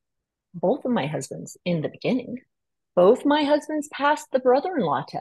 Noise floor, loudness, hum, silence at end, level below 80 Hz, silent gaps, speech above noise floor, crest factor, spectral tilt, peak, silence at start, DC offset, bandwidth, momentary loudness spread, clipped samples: -83 dBFS; -23 LUFS; none; 0 s; -70 dBFS; none; 60 dB; 16 dB; -5.5 dB/octave; -8 dBFS; 0.55 s; under 0.1%; 12.5 kHz; 13 LU; under 0.1%